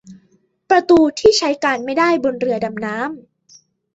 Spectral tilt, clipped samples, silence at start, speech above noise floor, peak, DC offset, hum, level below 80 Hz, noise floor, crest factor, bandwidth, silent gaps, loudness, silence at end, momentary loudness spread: -4 dB/octave; under 0.1%; 0.05 s; 43 dB; -2 dBFS; under 0.1%; none; -52 dBFS; -59 dBFS; 16 dB; 8 kHz; none; -16 LUFS; 0.75 s; 12 LU